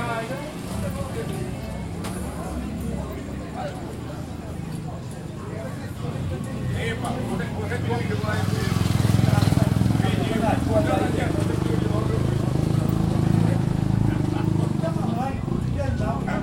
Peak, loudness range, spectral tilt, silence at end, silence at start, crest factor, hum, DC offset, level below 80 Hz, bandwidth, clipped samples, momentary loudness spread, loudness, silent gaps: -6 dBFS; 10 LU; -7 dB/octave; 0 s; 0 s; 18 dB; none; under 0.1%; -38 dBFS; 16.5 kHz; under 0.1%; 12 LU; -25 LUFS; none